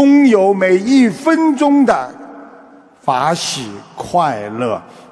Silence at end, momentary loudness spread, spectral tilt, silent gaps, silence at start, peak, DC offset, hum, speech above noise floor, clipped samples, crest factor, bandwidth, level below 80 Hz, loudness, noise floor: 0.3 s; 14 LU; -5 dB/octave; none; 0 s; -2 dBFS; under 0.1%; none; 28 dB; under 0.1%; 12 dB; 11 kHz; -56 dBFS; -14 LUFS; -42 dBFS